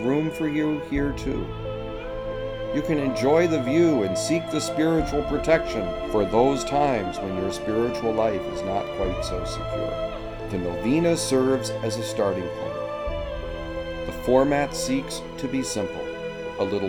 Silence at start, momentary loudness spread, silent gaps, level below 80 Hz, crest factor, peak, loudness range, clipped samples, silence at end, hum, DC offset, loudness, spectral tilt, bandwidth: 0 s; 11 LU; none; -40 dBFS; 18 dB; -6 dBFS; 4 LU; under 0.1%; 0 s; none; under 0.1%; -25 LUFS; -5.5 dB/octave; 19 kHz